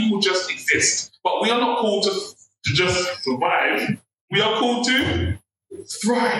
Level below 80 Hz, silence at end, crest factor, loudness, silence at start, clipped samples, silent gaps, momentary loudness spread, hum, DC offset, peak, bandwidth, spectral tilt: -52 dBFS; 0 s; 16 dB; -20 LUFS; 0 s; under 0.1%; 4.14-4.28 s; 10 LU; none; under 0.1%; -6 dBFS; 16.5 kHz; -3 dB/octave